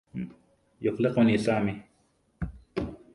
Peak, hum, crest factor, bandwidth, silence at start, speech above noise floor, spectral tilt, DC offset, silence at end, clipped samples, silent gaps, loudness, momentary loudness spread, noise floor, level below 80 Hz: -10 dBFS; none; 18 dB; 11 kHz; 0.15 s; 43 dB; -7.5 dB/octave; under 0.1%; 0.2 s; under 0.1%; none; -28 LUFS; 16 LU; -68 dBFS; -50 dBFS